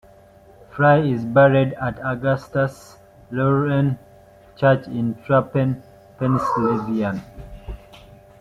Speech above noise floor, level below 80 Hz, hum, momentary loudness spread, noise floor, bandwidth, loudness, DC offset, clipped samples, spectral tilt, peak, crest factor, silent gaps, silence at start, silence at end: 29 dB; -48 dBFS; none; 19 LU; -48 dBFS; 9.4 kHz; -20 LUFS; under 0.1%; under 0.1%; -8.5 dB/octave; -2 dBFS; 18 dB; none; 0.75 s; 0.45 s